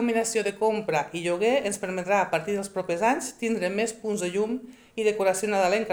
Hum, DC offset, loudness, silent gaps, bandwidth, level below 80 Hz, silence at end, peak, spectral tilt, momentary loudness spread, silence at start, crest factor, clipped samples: none; under 0.1%; -26 LUFS; none; over 20 kHz; -66 dBFS; 0 s; -10 dBFS; -4 dB/octave; 6 LU; 0 s; 16 dB; under 0.1%